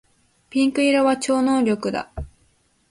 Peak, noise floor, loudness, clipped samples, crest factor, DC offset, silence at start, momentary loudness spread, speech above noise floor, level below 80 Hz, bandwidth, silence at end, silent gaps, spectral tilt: -8 dBFS; -62 dBFS; -20 LUFS; under 0.1%; 14 dB; under 0.1%; 0.55 s; 18 LU; 43 dB; -46 dBFS; 11.5 kHz; 0.65 s; none; -4.5 dB/octave